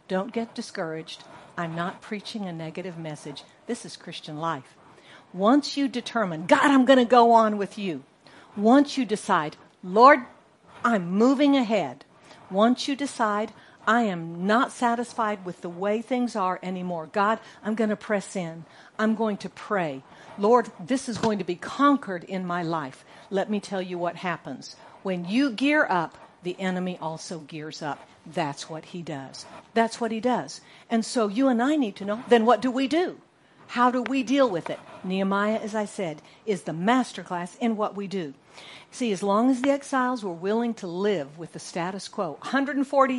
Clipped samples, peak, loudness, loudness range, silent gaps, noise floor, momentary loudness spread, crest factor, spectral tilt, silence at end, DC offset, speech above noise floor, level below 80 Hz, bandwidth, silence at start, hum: under 0.1%; -2 dBFS; -25 LUFS; 10 LU; none; -51 dBFS; 16 LU; 22 dB; -5.5 dB/octave; 0 s; under 0.1%; 26 dB; -74 dBFS; 11.5 kHz; 0.1 s; none